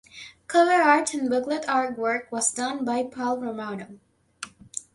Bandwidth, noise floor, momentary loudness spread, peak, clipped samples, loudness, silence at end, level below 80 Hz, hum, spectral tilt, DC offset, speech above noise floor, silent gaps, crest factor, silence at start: 11.5 kHz; -44 dBFS; 21 LU; -4 dBFS; under 0.1%; -24 LUFS; 0.15 s; -68 dBFS; none; -2.5 dB/octave; under 0.1%; 20 dB; none; 20 dB; 0.15 s